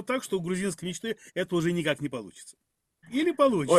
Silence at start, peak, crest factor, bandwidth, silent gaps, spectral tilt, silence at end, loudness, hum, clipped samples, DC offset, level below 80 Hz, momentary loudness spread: 0 s; -8 dBFS; 20 dB; 14.5 kHz; none; -5 dB/octave; 0 s; -29 LUFS; none; under 0.1%; under 0.1%; -64 dBFS; 15 LU